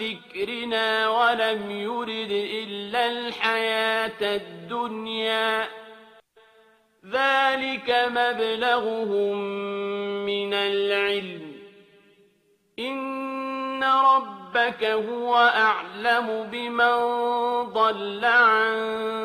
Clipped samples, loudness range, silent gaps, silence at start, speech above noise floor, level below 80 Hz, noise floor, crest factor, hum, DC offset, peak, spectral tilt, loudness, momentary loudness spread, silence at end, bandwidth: under 0.1%; 6 LU; none; 0 s; 41 dB; -72 dBFS; -65 dBFS; 18 dB; none; under 0.1%; -8 dBFS; -4 dB/octave; -24 LUFS; 11 LU; 0 s; 14 kHz